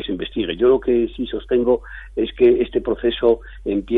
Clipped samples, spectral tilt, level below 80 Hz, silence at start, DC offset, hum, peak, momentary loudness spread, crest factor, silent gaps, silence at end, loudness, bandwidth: under 0.1%; -8.5 dB/octave; -38 dBFS; 0 s; under 0.1%; none; -4 dBFS; 9 LU; 14 dB; none; 0 s; -19 LUFS; 4 kHz